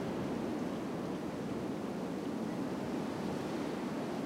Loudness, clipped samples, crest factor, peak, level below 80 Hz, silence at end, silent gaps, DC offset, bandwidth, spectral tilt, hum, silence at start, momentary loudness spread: -38 LUFS; under 0.1%; 12 dB; -26 dBFS; -64 dBFS; 0 s; none; under 0.1%; 16 kHz; -6.5 dB/octave; none; 0 s; 2 LU